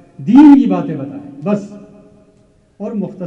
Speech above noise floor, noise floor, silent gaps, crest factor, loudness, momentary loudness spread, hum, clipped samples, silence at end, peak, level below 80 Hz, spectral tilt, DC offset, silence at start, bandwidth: 39 dB; -51 dBFS; none; 14 dB; -11 LUFS; 22 LU; none; under 0.1%; 0 s; 0 dBFS; -52 dBFS; -9 dB/octave; under 0.1%; 0.2 s; 6.2 kHz